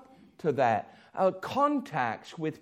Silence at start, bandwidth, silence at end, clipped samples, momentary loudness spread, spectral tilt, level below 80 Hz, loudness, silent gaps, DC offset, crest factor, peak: 0 s; 15.5 kHz; 0.05 s; under 0.1%; 8 LU; -6.5 dB/octave; -74 dBFS; -29 LUFS; none; under 0.1%; 18 dB; -12 dBFS